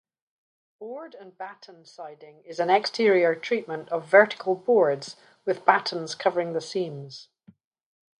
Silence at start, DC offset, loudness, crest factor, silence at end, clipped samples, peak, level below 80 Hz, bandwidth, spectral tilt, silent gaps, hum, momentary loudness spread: 0.8 s; under 0.1%; -24 LUFS; 24 dB; 1 s; under 0.1%; -2 dBFS; -82 dBFS; 10.5 kHz; -4.5 dB/octave; none; none; 22 LU